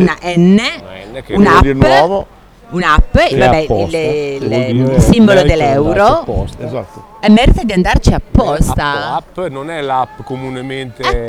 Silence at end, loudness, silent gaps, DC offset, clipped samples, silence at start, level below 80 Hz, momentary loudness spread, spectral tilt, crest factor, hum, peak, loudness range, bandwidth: 0 s; -12 LUFS; none; under 0.1%; 0.7%; 0 s; -20 dBFS; 15 LU; -6.5 dB/octave; 12 dB; none; 0 dBFS; 3 LU; 15 kHz